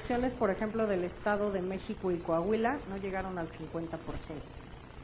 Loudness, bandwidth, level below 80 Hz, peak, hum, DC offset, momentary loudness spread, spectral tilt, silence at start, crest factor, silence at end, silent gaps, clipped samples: -34 LUFS; 4 kHz; -52 dBFS; -16 dBFS; none; under 0.1%; 13 LU; -6 dB/octave; 0 s; 18 dB; 0 s; none; under 0.1%